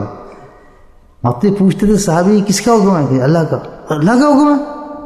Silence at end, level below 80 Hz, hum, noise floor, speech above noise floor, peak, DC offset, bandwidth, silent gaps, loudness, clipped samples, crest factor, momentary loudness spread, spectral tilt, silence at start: 0 s; -38 dBFS; none; -42 dBFS; 31 dB; 0 dBFS; under 0.1%; 14 kHz; none; -12 LUFS; under 0.1%; 12 dB; 12 LU; -6.5 dB/octave; 0 s